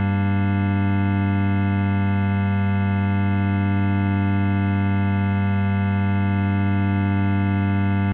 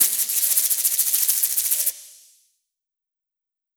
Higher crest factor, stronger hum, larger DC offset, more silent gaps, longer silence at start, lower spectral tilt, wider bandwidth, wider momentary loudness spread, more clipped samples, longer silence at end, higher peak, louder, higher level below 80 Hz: second, 10 dB vs 24 dB; neither; neither; neither; about the same, 0 s vs 0 s; first, -8 dB/octave vs 4 dB/octave; second, 4 kHz vs over 20 kHz; second, 0 LU vs 3 LU; neither; second, 0 s vs 1.65 s; second, -10 dBFS vs 0 dBFS; second, -21 LUFS vs -18 LUFS; first, -58 dBFS vs -78 dBFS